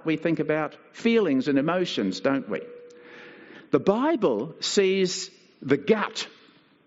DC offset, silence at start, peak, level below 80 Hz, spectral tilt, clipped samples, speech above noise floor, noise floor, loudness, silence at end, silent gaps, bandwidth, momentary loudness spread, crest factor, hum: under 0.1%; 0.05 s; -6 dBFS; -72 dBFS; -4 dB/octave; under 0.1%; 32 dB; -57 dBFS; -25 LUFS; 0.6 s; none; 8 kHz; 16 LU; 20 dB; none